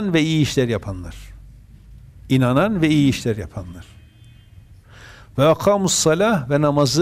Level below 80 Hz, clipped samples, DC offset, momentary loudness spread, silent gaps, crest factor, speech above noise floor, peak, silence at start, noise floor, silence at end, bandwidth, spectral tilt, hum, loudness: -44 dBFS; under 0.1%; under 0.1%; 16 LU; none; 14 dB; 28 dB; -6 dBFS; 0 s; -46 dBFS; 0 s; 15.5 kHz; -5 dB/octave; none; -18 LUFS